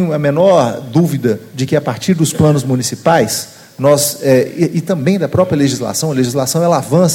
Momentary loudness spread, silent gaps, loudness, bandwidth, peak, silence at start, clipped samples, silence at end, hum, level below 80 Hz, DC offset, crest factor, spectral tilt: 5 LU; none; -13 LUFS; 17 kHz; 0 dBFS; 0 s; under 0.1%; 0 s; none; -48 dBFS; under 0.1%; 12 dB; -5.5 dB/octave